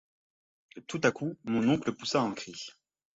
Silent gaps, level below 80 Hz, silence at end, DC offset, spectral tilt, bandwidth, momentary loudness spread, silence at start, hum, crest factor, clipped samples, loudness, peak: none; -68 dBFS; 0.45 s; under 0.1%; -5 dB/octave; 8 kHz; 15 LU; 0.75 s; none; 22 dB; under 0.1%; -31 LUFS; -10 dBFS